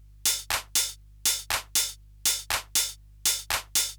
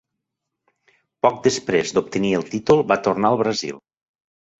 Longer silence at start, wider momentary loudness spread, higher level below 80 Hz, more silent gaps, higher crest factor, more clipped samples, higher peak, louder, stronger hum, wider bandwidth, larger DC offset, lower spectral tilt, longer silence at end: second, 0.25 s vs 1.25 s; second, 3 LU vs 6 LU; first, -50 dBFS vs -56 dBFS; neither; about the same, 18 dB vs 20 dB; neither; second, -12 dBFS vs -2 dBFS; second, -26 LUFS vs -20 LUFS; first, 50 Hz at -50 dBFS vs none; first, over 20 kHz vs 8 kHz; neither; second, 1.5 dB/octave vs -5 dB/octave; second, 0 s vs 0.8 s